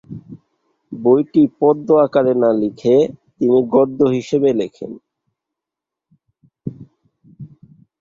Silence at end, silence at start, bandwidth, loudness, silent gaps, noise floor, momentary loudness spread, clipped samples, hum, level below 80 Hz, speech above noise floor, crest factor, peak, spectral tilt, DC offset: 0.55 s; 0.1 s; 7.6 kHz; -16 LUFS; none; -85 dBFS; 19 LU; under 0.1%; none; -60 dBFS; 70 dB; 16 dB; -2 dBFS; -8 dB/octave; under 0.1%